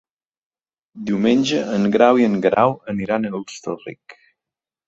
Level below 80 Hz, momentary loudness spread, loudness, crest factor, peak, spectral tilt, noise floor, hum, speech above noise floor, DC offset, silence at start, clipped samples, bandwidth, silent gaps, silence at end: -58 dBFS; 15 LU; -18 LUFS; 18 dB; -2 dBFS; -6 dB/octave; -88 dBFS; none; 69 dB; under 0.1%; 0.95 s; under 0.1%; 8 kHz; none; 0.75 s